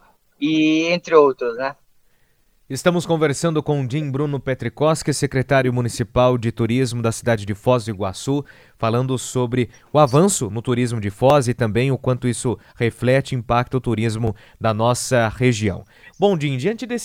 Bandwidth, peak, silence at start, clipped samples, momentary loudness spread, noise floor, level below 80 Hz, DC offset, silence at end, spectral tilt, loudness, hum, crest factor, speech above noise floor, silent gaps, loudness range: 16 kHz; 0 dBFS; 0.4 s; under 0.1%; 8 LU; -59 dBFS; -46 dBFS; under 0.1%; 0 s; -5.5 dB/octave; -20 LUFS; none; 20 dB; 40 dB; none; 3 LU